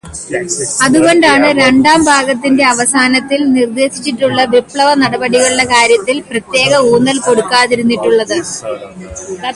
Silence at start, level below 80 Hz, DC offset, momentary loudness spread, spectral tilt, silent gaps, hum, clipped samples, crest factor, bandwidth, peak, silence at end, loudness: 0.05 s; -44 dBFS; under 0.1%; 12 LU; -3 dB/octave; none; none; under 0.1%; 10 dB; 11.5 kHz; 0 dBFS; 0 s; -10 LUFS